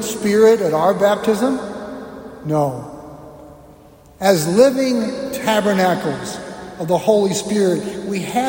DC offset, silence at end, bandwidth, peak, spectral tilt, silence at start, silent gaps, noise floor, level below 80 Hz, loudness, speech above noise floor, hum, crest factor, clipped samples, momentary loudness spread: under 0.1%; 0 s; 16.5 kHz; -2 dBFS; -5 dB/octave; 0 s; none; -45 dBFS; -52 dBFS; -17 LUFS; 28 dB; none; 16 dB; under 0.1%; 18 LU